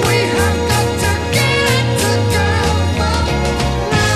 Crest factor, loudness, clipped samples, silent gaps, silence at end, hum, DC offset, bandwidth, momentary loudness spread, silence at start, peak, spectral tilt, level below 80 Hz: 12 dB; -15 LUFS; under 0.1%; none; 0 s; none; 0.6%; 15 kHz; 3 LU; 0 s; -2 dBFS; -4.5 dB/octave; -26 dBFS